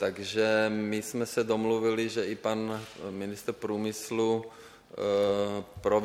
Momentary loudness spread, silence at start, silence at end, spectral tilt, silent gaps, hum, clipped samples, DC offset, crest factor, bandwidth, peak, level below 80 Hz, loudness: 10 LU; 0 s; 0 s; -5 dB/octave; none; none; under 0.1%; under 0.1%; 16 dB; 16.5 kHz; -14 dBFS; -64 dBFS; -30 LUFS